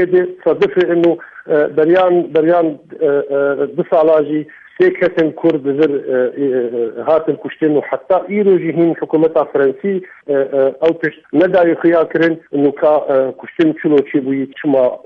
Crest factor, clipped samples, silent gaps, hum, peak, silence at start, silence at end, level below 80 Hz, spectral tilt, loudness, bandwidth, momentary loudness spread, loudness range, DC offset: 12 dB; under 0.1%; none; none; -2 dBFS; 0 s; 0.1 s; -60 dBFS; -9 dB/octave; -14 LUFS; 5 kHz; 7 LU; 2 LU; under 0.1%